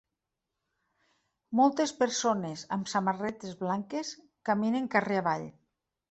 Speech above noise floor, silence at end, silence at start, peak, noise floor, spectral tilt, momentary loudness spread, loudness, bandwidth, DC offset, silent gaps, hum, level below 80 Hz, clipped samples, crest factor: 57 dB; 0.6 s; 1.5 s; -10 dBFS; -86 dBFS; -4.5 dB/octave; 11 LU; -30 LUFS; 8.4 kHz; under 0.1%; none; none; -74 dBFS; under 0.1%; 22 dB